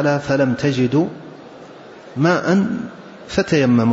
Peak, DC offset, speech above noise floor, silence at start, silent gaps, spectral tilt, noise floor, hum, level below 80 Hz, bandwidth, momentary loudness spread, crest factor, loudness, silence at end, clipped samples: -6 dBFS; under 0.1%; 22 dB; 0 s; none; -7 dB/octave; -39 dBFS; none; -50 dBFS; 8 kHz; 23 LU; 14 dB; -18 LUFS; 0 s; under 0.1%